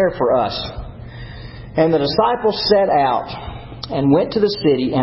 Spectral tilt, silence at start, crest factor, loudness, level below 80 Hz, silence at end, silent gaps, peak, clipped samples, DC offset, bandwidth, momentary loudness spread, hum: -10 dB/octave; 0 s; 16 dB; -17 LUFS; -40 dBFS; 0 s; none; -2 dBFS; under 0.1%; under 0.1%; 5.8 kHz; 19 LU; none